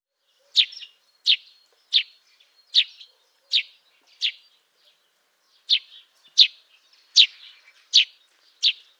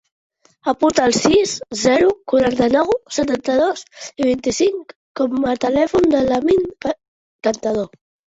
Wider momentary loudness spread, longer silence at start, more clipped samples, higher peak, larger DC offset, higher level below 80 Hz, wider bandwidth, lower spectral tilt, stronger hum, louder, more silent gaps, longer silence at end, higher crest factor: about the same, 11 LU vs 10 LU; about the same, 0.55 s vs 0.65 s; neither; about the same, -2 dBFS vs -2 dBFS; neither; second, under -90 dBFS vs -48 dBFS; first, 12.5 kHz vs 8.4 kHz; second, 8.5 dB/octave vs -4 dB/octave; neither; about the same, -20 LUFS vs -18 LUFS; second, none vs 4.96-5.15 s, 7.08-7.39 s; second, 0.25 s vs 0.5 s; first, 24 dB vs 16 dB